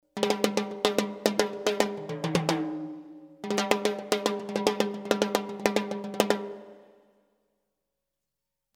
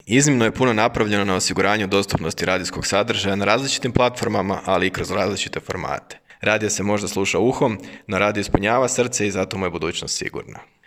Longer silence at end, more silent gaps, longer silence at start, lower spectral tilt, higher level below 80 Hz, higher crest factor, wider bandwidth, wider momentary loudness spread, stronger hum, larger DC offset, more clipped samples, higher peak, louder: first, 1.95 s vs 0.25 s; neither; about the same, 0.15 s vs 0.05 s; about the same, -4 dB/octave vs -4 dB/octave; second, -68 dBFS vs -46 dBFS; first, 28 dB vs 20 dB; first, over 20 kHz vs 16 kHz; first, 10 LU vs 7 LU; neither; neither; neither; about the same, -2 dBFS vs 0 dBFS; second, -28 LUFS vs -20 LUFS